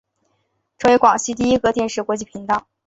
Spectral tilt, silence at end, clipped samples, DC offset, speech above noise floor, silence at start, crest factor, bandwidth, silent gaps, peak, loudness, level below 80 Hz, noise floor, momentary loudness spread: -4 dB/octave; 0.25 s; under 0.1%; under 0.1%; 51 dB; 0.8 s; 18 dB; 8.2 kHz; none; -2 dBFS; -18 LUFS; -48 dBFS; -69 dBFS; 10 LU